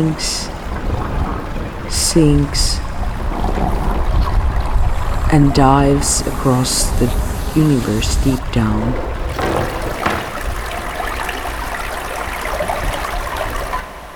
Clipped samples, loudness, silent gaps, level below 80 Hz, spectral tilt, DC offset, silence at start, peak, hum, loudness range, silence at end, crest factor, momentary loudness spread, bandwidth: under 0.1%; -18 LUFS; none; -22 dBFS; -4.5 dB/octave; under 0.1%; 0 s; 0 dBFS; none; 7 LU; 0 s; 16 dB; 11 LU; 19.5 kHz